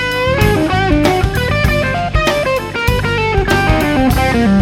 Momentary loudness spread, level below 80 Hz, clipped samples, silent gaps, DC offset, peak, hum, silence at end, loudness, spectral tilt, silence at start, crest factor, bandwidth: 3 LU; -22 dBFS; under 0.1%; none; under 0.1%; 0 dBFS; none; 0 s; -13 LUFS; -6 dB/octave; 0 s; 12 dB; 17.5 kHz